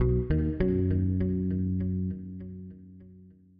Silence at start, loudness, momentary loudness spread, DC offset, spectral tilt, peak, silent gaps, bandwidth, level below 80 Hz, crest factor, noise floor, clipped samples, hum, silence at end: 0 s; -29 LUFS; 17 LU; under 0.1%; -11 dB/octave; -14 dBFS; none; 4.6 kHz; -38 dBFS; 14 dB; -53 dBFS; under 0.1%; none; 0.3 s